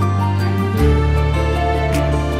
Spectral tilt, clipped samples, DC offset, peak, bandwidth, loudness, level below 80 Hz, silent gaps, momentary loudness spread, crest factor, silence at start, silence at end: -7 dB/octave; under 0.1%; under 0.1%; -4 dBFS; 15 kHz; -17 LUFS; -20 dBFS; none; 3 LU; 12 dB; 0 s; 0 s